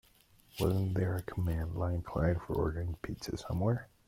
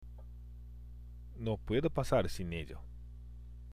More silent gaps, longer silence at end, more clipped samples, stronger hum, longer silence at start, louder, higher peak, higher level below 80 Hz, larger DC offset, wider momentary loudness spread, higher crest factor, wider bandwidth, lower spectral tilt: neither; first, 0.25 s vs 0 s; neither; second, none vs 60 Hz at -50 dBFS; first, 0.55 s vs 0 s; about the same, -35 LUFS vs -36 LUFS; about the same, -18 dBFS vs -18 dBFS; about the same, -48 dBFS vs -48 dBFS; neither; second, 8 LU vs 19 LU; about the same, 16 dB vs 20 dB; about the same, 16.5 kHz vs 15.5 kHz; about the same, -7.5 dB/octave vs -6.5 dB/octave